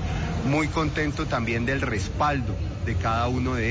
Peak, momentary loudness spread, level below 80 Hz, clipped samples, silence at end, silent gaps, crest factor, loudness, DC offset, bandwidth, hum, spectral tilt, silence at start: -12 dBFS; 4 LU; -34 dBFS; under 0.1%; 0 s; none; 12 dB; -26 LUFS; under 0.1%; 7.8 kHz; none; -6 dB/octave; 0 s